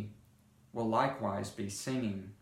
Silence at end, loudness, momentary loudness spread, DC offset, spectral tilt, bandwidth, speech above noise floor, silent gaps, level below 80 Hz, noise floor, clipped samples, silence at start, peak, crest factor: 0.05 s; -35 LUFS; 10 LU; under 0.1%; -5.5 dB/octave; 16 kHz; 29 dB; none; -68 dBFS; -64 dBFS; under 0.1%; 0 s; -16 dBFS; 20 dB